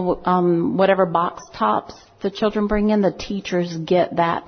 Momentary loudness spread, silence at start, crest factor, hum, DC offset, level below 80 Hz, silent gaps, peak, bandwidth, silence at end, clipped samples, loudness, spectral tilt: 8 LU; 0 s; 16 dB; none; under 0.1%; -44 dBFS; none; -4 dBFS; 6.6 kHz; 0 s; under 0.1%; -20 LUFS; -7 dB/octave